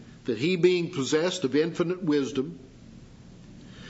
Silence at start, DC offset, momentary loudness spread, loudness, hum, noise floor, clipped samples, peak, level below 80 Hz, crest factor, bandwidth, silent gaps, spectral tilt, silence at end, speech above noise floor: 0 s; under 0.1%; 12 LU; -26 LUFS; none; -48 dBFS; under 0.1%; -10 dBFS; -60 dBFS; 18 dB; 8 kHz; none; -5.5 dB/octave; 0 s; 23 dB